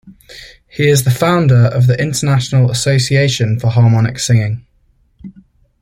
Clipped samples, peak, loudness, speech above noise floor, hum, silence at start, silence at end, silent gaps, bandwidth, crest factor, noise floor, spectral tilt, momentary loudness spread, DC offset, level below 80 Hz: under 0.1%; 0 dBFS; -13 LUFS; 43 dB; none; 0.05 s; 0.5 s; none; 15.5 kHz; 12 dB; -55 dBFS; -5.5 dB/octave; 4 LU; under 0.1%; -44 dBFS